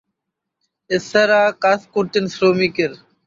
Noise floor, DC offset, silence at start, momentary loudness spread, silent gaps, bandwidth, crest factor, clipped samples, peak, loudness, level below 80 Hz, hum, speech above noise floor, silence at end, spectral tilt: -80 dBFS; under 0.1%; 0.9 s; 8 LU; none; 7.6 kHz; 16 dB; under 0.1%; -2 dBFS; -17 LUFS; -60 dBFS; none; 63 dB; 0.3 s; -5 dB/octave